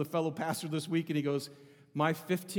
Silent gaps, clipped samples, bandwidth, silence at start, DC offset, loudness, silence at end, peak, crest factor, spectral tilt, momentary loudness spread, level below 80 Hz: none; under 0.1%; 20 kHz; 0 s; under 0.1%; -34 LUFS; 0 s; -14 dBFS; 20 dB; -5.5 dB/octave; 5 LU; -86 dBFS